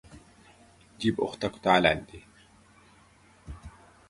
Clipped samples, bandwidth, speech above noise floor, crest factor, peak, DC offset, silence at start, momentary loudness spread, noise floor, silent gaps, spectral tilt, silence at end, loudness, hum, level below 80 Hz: under 0.1%; 11.5 kHz; 32 dB; 26 dB; -4 dBFS; under 0.1%; 0.15 s; 25 LU; -59 dBFS; none; -5.5 dB/octave; 0.4 s; -26 LUFS; none; -54 dBFS